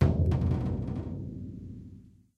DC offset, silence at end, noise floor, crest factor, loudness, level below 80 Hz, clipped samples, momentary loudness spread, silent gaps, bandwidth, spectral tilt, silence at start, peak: under 0.1%; 0.3 s; -52 dBFS; 22 dB; -31 LUFS; -38 dBFS; under 0.1%; 18 LU; none; 6 kHz; -10 dB/octave; 0 s; -10 dBFS